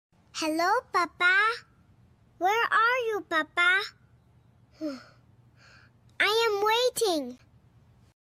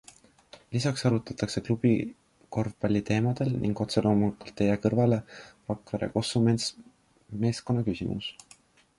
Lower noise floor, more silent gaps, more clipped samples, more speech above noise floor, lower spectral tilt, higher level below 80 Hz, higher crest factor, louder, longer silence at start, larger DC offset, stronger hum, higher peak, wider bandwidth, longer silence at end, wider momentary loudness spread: about the same, -60 dBFS vs -59 dBFS; neither; neither; about the same, 34 dB vs 32 dB; second, -1.5 dB/octave vs -6.5 dB/octave; second, -70 dBFS vs -54 dBFS; about the same, 18 dB vs 20 dB; first, -25 LUFS vs -28 LUFS; second, 0.35 s vs 0.7 s; neither; neither; about the same, -12 dBFS vs -10 dBFS; first, 15.5 kHz vs 11.5 kHz; first, 0.85 s vs 0.65 s; first, 15 LU vs 11 LU